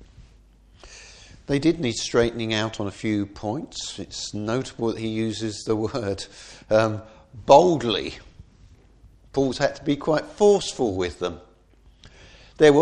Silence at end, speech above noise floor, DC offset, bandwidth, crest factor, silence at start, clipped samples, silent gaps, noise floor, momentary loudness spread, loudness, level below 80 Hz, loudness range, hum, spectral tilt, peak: 0 s; 32 dB; under 0.1%; 10.5 kHz; 24 dB; 0.2 s; under 0.1%; none; -55 dBFS; 17 LU; -23 LUFS; -50 dBFS; 5 LU; none; -5 dB/octave; 0 dBFS